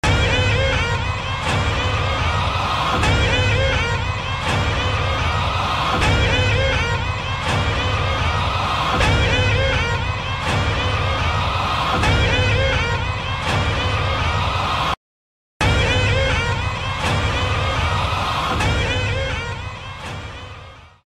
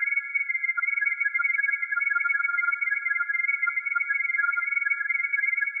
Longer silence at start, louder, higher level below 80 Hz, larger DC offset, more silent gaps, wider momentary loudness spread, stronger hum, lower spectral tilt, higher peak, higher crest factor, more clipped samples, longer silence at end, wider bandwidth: about the same, 0.05 s vs 0 s; first, -19 LUFS vs -24 LUFS; first, -28 dBFS vs under -90 dBFS; neither; first, 14.97-15.60 s vs none; first, 6 LU vs 2 LU; neither; first, -4.5 dB/octave vs 5 dB/octave; first, -4 dBFS vs -14 dBFS; about the same, 14 dB vs 12 dB; neither; first, 0.2 s vs 0 s; first, 12 kHz vs 2.6 kHz